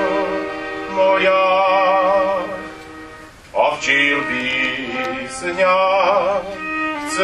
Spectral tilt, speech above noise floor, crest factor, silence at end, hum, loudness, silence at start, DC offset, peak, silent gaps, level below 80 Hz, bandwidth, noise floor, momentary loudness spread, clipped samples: -3.5 dB/octave; 22 dB; 16 dB; 0 s; none; -17 LUFS; 0 s; under 0.1%; -2 dBFS; none; -50 dBFS; 12 kHz; -39 dBFS; 13 LU; under 0.1%